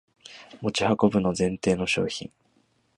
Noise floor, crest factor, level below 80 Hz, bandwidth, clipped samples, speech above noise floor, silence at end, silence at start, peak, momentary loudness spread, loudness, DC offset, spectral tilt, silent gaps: -67 dBFS; 22 dB; -54 dBFS; 11 kHz; under 0.1%; 42 dB; 0.7 s; 0.3 s; -6 dBFS; 22 LU; -25 LUFS; under 0.1%; -5 dB/octave; none